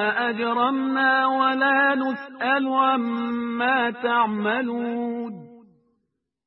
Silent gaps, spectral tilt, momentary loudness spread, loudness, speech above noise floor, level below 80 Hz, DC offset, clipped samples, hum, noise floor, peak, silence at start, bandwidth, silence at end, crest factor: none; -9 dB/octave; 9 LU; -22 LUFS; 54 dB; -74 dBFS; under 0.1%; under 0.1%; none; -76 dBFS; -8 dBFS; 0 s; 5.8 kHz; 0.9 s; 16 dB